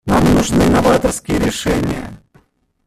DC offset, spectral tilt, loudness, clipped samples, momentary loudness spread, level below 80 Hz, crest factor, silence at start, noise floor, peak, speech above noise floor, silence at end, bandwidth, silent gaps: under 0.1%; -5.5 dB/octave; -15 LUFS; under 0.1%; 10 LU; -30 dBFS; 14 dB; 0.05 s; -55 dBFS; 0 dBFS; 40 dB; 0.7 s; 15 kHz; none